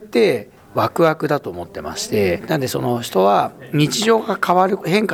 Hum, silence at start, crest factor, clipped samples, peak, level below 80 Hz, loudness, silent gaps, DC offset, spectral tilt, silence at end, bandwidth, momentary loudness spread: none; 0 s; 16 dB; under 0.1%; -2 dBFS; -54 dBFS; -18 LUFS; none; under 0.1%; -5 dB/octave; 0 s; 19.5 kHz; 10 LU